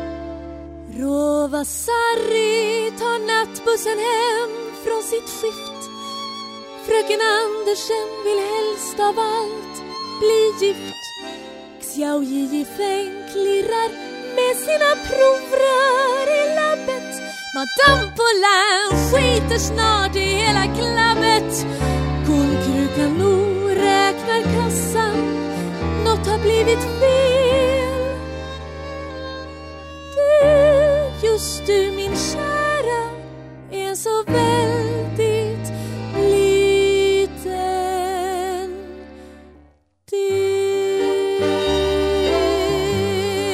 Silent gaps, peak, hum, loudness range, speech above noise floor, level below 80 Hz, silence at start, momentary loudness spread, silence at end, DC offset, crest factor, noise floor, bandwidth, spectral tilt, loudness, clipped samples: none; -2 dBFS; none; 6 LU; 35 dB; -36 dBFS; 0 s; 15 LU; 0 s; under 0.1%; 18 dB; -53 dBFS; 16 kHz; -4 dB/octave; -19 LUFS; under 0.1%